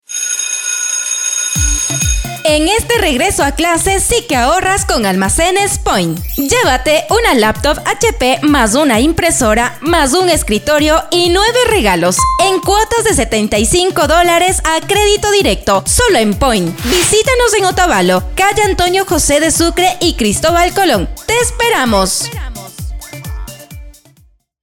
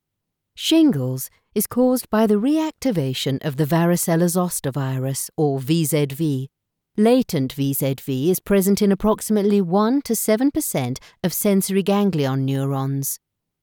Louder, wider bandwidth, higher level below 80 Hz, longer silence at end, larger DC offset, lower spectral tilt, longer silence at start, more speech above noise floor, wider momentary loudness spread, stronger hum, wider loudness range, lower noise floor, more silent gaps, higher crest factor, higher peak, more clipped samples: first, -11 LUFS vs -20 LUFS; about the same, over 20 kHz vs over 20 kHz; first, -26 dBFS vs -52 dBFS; first, 0.7 s vs 0.45 s; neither; second, -3 dB/octave vs -5.5 dB/octave; second, 0.1 s vs 0.55 s; second, 38 dB vs 60 dB; about the same, 5 LU vs 7 LU; neither; about the same, 2 LU vs 2 LU; second, -49 dBFS vs -80 dBFS; neither; about the same, 12 dB vs 14 dB; first, 0 dBFS vs -6 dBFS; neither